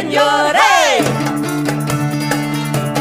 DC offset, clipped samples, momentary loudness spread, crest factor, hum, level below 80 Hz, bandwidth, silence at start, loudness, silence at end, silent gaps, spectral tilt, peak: under 0.1%; under 0.1%; 8 LU; 14 dB; none; -48 dBFS; 15.5 kHz; 0 s; -14 LUFS; 0 s; none; -4.5 dB/octave; 0 dBFS